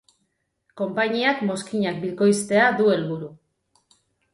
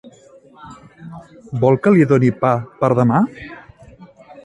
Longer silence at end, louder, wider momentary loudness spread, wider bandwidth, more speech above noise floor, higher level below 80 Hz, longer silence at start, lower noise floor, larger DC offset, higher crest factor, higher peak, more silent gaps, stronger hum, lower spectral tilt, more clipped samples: first, 1 s vs 0.4 s; second, -22 LUFS vs -15 LUFS; second, 12 LU vs 24 LU; about the same, 11.5 kHz vs 10.5 kHz; first, 52 dB vs 31 dB; second, -68 dBFS vs -52 dBFS; first, 0.75 s vs 0.05 s; first, -73 dBFS vs -46 dBFS; neither; about the same, 18 dB vs 18 dB; second, -6 dBFS vs 0 dBFS; neither; neither; second, -5 dB/octave vs -9.5 dB/octave; neither